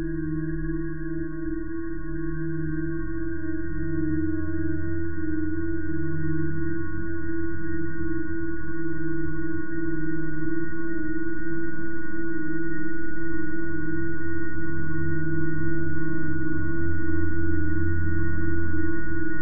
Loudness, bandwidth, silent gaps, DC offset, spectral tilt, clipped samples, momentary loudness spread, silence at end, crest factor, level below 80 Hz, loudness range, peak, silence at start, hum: -30 LUFS; 2 kHz; none; 10%; -12.5 dB/octave; under 0.1%; 4 LU; 0 s; 12 dB; -38 dBFS; 3 LU; -10 dBFS; 0 s; none